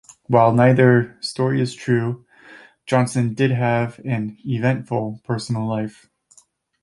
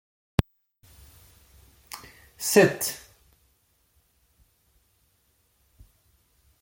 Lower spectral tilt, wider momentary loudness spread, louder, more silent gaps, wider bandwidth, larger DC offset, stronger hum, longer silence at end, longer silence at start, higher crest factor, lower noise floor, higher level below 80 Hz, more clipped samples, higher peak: first, -7 dB/octave vs -4.5 dB/octave; second, 13 LU vs 24 LU; first, -20 LUFS vs -24 LUFS; neither; second, 11.5 kHz vs 17 kHz; neither; neither; second, 0.95 s vs 3.65 s; about the same, 0.3 s vs 0.4 s; second, 18 dB vs 28 dB; second, -56 dBFS vs -68 dBFS; second, -58 dBFS vs -48 dBFS; neither; about the same, -2 dBFS vs -2 dBFS